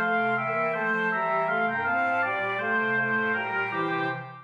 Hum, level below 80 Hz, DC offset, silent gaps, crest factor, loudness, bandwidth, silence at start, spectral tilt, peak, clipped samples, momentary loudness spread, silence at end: none; -84 dBFS; under 0.1%; none; 12 dB; -26 LUFS; 8 kHz; 0 s; -7 dB/octave; -14 dBFS; under 0.1%; 3 LU; 0 s